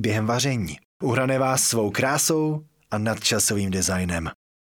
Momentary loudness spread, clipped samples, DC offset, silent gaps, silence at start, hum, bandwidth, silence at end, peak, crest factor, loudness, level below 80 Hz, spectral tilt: 10 LU; under 0.1%; under 0.1%; 0.85-1.00 s; 0 s; none; 20 kHz; 0.4 s; -4 dBFS; 20 dB; -23 LUFS; -50 dBFS; -3.5 dB/octave